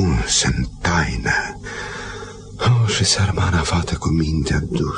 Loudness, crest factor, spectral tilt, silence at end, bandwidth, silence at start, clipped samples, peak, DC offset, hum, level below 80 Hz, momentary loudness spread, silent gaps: -19 LUFS; 16 dB; -4 dB/octave; 0 s; 10 kHz; 0 s; under 0.1%; -4 dBFS; under 0.1%; none; -30 dBFS; 13 LU; none